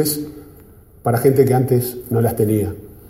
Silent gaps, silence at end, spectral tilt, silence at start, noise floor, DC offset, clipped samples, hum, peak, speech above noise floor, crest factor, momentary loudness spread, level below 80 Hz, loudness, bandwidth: none; 0.1 s; -6.5 dB/octave; 0 s; -44 dBFS; under 0.1%; under 0.1%; none; -2 dBFS; 28 dB; 16 dB; 11 LU; -46 dBFS; -18 LUFS; 16.5 kHz